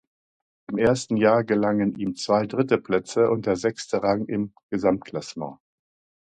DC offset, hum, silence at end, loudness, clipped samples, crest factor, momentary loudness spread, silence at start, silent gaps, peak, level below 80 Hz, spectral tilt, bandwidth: under 0.1%; none; 0.7 s; -24 LUFS; under 0.1%; 20 dB; 11 LU; 0.7 s; 4.63-4.69 s; -4 dBFS; -58 dBFS; -6 dB/octave; 9.4 kHz